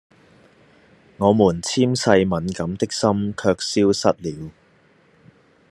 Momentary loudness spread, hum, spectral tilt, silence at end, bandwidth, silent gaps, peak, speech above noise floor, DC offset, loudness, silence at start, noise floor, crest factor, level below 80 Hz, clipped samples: 11 LU; none; -5 dB/octave; 1.2 s; 12.5 kHz; none; 0 dBFS; 37 dB; under 0.1%; -20 LUFS; 1.2 s; -56 dBFS; 20 dB; -58 dBFS; under 0.1%